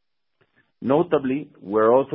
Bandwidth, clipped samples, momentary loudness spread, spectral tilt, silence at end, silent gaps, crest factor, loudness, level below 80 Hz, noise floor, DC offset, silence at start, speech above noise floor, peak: 3.9 kHz; under 0.1%; 11 LU; -11.5 dB/octave; 0 s; none; 18 dB; -22 LUFS; -62 dBFS; -69 dBFS; under 0.1%; 0.8 s; 49 dB; -6 dBFS